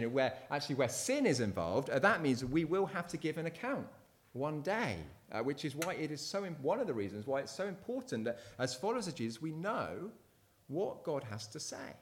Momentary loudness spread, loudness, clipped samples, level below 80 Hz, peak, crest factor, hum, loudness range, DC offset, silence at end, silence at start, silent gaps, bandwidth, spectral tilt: 10 LU; -37 LUFS; under 0.1%; -68 dBFS; -16 dBFS; 22 dB; none; 6 LU; under 0.1%; 0 s; 0 s; none; 18.5 kHz; -5 dB/octave